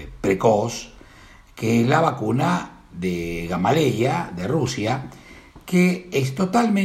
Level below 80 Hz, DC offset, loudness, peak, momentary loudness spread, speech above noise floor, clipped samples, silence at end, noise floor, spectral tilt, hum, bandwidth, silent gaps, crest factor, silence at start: -48 dBFS; under 0.1%; -21 LUFS; -4 dBFS; 10 LU; 26 dB; under 0.1%; 0 s; -47 dBFS; -6 dB/octave; none; 15 kHz; none; 18 dB; 0 s